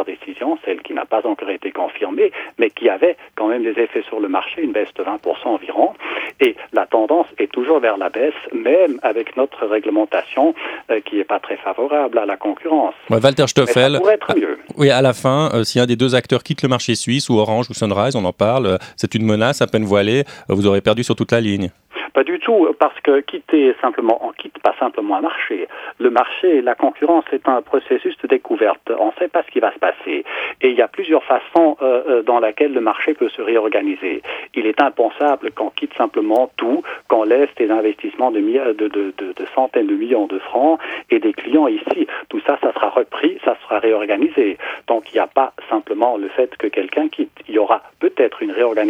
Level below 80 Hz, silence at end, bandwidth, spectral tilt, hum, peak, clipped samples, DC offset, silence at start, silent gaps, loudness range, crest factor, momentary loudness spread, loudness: -62 dBFS; 0 s; 13.5 kHz; -5.5 dB/octave; none; 0 dBFS; under 0.1%; under 0.1%; 0 s; none; 3 LU; 16 dB; 7 LU; -17 LUFS